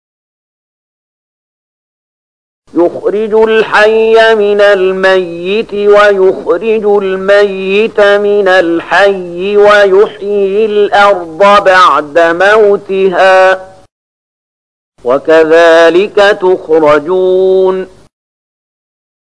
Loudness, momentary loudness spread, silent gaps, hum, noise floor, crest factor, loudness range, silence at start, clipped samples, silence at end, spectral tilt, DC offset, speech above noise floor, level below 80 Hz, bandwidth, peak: -7 LUFS; 7 LU; 13.92-14.92 s; none; under -90 dBFS; 8 dB; 4 LU; 2.75 s; 0.3%; 1.45 s; -5 dB/octave; 0.8%; over 83 dB; -46 dBFS; 10.5 kHz; 0 dBFS